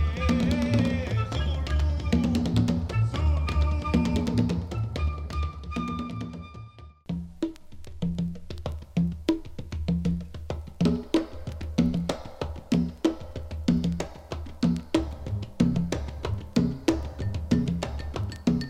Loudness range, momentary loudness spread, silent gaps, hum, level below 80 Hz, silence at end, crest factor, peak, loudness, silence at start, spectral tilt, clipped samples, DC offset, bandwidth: 7 LU; 12 LU; none; none; -34 dBFS; 0 s; 22 dB; -6 dBFS; -28 LUFS; 0 s; -7 dB/octave; under 0.1%; under 0.1%; 12 kHz